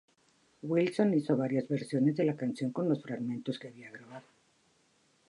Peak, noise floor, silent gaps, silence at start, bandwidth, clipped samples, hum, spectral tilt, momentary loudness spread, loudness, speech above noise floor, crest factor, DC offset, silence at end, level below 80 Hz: -16 dBFS; -70 dBFS; none; 0.65 s; 11.5 kHz; under 0.1%; none; -8 dB/octave; 20 LU; -32 LUFS; 38 dB; 18 dB; under 0.1%; 1.1 s; -80 dBFS